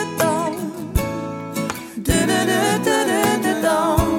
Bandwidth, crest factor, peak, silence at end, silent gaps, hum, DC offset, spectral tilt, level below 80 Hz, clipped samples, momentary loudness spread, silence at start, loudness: 17.5 kHz; 16 dB; -2 dBFS; 0 s; none; none; under 0.1%; -4.5 dB/octave; -32 dBFS; under 0.1%; 9 LU; 0 s; -20 LUFS